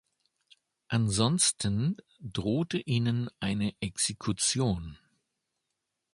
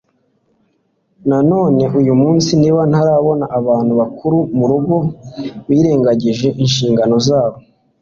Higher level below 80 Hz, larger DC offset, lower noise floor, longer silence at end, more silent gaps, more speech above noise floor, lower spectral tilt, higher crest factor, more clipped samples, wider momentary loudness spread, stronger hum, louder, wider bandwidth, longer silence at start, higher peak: second, -54 dBFS vs -48 dBFS; neither; first, -84 dBFS vs -62 dBFS; first, 1.2 s vs 0.4 s; neither; first, 54 dB vs 49 dB; second, -4 dB/octave vs -7 dB/octave; first, 22 dB vs 12 dB; neither; first, 9 LU vs 5 LU; neither; second, -29 LUFS vs -13 LUFS; first, 11.5 kHz vs 7.6 kHz; second, 0.9 s vs 1.25 s; second, -10 dBFS vs -2 dBFS